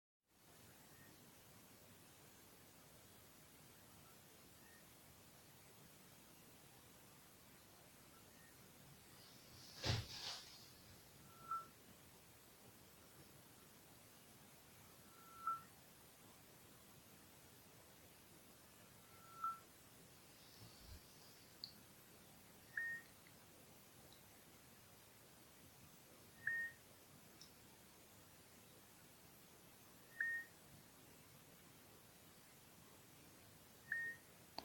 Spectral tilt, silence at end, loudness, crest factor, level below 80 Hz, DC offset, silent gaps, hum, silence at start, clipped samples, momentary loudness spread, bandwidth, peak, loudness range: -3 dB/octave; 0 s; -55 LUFS; 28 dB; -76 dBFS; under 0.1%; none; none; 0.3 s; under 0.1%; 16 LU; 17 kHz; -28 dBFS; 12 LU